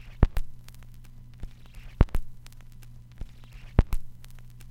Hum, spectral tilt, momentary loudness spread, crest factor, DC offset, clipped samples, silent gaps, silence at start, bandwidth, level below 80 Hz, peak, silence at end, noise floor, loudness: none; -8 dB/octave; 23 LU; 28 dB; under 0.1%; under 0.1%; none; 0.05 s; 16 kHz; -30 dBFS; -2 dBFS; 0.25 s; -45 dBFS; -30 LUFS